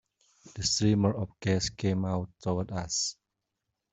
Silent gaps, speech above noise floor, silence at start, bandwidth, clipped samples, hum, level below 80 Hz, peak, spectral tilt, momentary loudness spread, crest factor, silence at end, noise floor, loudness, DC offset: none; 55 dB; 0.45 s; 8.2 kHz; under 0.1%; none; -56 dBFS; -12 dBFS; -4.5 dB/octave; 8 LU; 20 dB; 0.8 s; -84 dBFS; -30 LUFS; under 0.1%